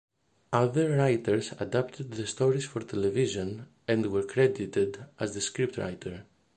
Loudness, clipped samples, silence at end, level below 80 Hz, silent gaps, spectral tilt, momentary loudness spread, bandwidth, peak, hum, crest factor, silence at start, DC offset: -29 LUFS; under 0.1%; 0.35 s; -60 dBFS; none; -5.5 dB/octave; 10 LU; 9.6 kHz; -10 dBFS; none; 20 dB; 0.5 s; under 0.1%